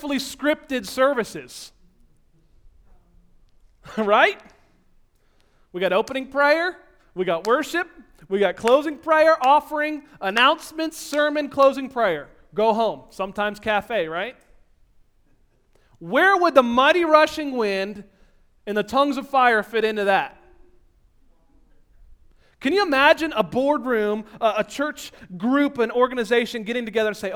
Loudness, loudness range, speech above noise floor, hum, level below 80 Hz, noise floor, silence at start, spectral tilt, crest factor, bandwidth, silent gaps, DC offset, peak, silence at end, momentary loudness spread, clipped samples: -21 LUFS; 6 LU; 39 dB; none; -56 dBFS; -60 dBFS; 0 s; -4 dB/octave; 22 dB; 19 kHz; none; under 0.1%; 0 dBFS; 0 s; 14 LU; under 0.1%